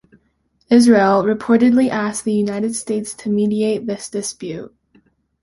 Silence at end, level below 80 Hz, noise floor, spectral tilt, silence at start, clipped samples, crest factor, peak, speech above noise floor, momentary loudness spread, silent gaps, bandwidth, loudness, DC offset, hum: 0.75 s; -56 dBFS; -64 dBFS; -5 dB/octave; 0.7 s; under 0.1%; 16 dB; -2 dBFS; 47 dB; 13 LU; none; 11.5 kHz; -17 LUFS; under 0.1%; none